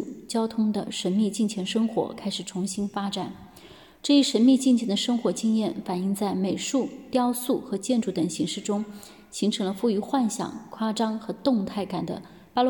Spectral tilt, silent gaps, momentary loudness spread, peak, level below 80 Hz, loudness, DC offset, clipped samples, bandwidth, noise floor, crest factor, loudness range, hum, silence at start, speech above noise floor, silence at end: -5 dB/octave; none; 10 LU; -10 dBFS; -66 dBFS; -26 LUFS; under 0.1%; under 0.1%; 17.5 kHz; -49 dBFS; 16 dB; 4 LU; none; 0 s; 24 dB; 0 s